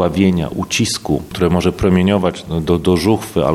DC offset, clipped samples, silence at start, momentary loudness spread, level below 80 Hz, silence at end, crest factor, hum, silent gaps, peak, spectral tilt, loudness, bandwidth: under 0.1%; under 0.1%; 0 s; 6 LU; -34 dBFS; 0 s; 16 dB; none; none; 0 dBFS; -5.5 dB/octave; -16 LUFS; 15 kHz